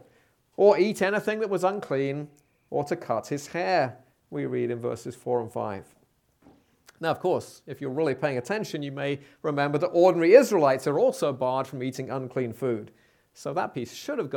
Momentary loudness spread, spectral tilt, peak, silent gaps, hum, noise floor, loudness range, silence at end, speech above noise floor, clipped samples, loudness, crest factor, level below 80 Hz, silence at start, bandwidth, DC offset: 14 LU; -6 dB/octave; -2 dBFS; none; none; -64 dBFS; 9 LU; 0 s; 38 dB; under 0.1%; -26 LUFS; 24 dB; -72 dBFS; 0.6 s; 18 kHz; under 0.1%